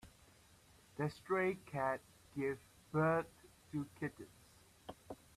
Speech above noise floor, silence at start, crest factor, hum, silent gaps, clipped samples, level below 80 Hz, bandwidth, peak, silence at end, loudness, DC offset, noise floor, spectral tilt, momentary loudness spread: 27 dB; 0.05 s; 18 dB; none; none; under 0.1%; -72 dBFS; 14.5 kHz; -24 dBFS; 0.25 s; -40 LUFS; under 0.1%; -66 dBFS; -7 dB/octave; 20 LU